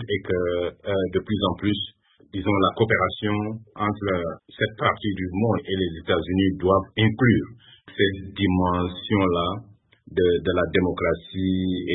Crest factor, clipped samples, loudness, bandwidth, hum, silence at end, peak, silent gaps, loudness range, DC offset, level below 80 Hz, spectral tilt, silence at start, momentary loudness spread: 18 dB; under 0.1%; -24 LUFS; 4 kHz; none; 0 s; -6 dBFS; none; 2 LU; under 0.1%; -48 dBFS; -11 dB/octave; 0 s; 7 LU